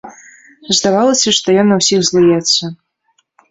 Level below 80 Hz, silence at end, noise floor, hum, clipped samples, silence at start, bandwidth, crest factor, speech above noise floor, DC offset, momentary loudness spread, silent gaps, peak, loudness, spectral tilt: -54 dBFS; 0.75 s; -62 dBFS; none; under 0.1%; 0.05 s; 8.2 kHz; 14 dB; 50 dB; under 0.1%; 4 LU; none; 0 dBFS; -11 LUFS; -3.5 dB/octave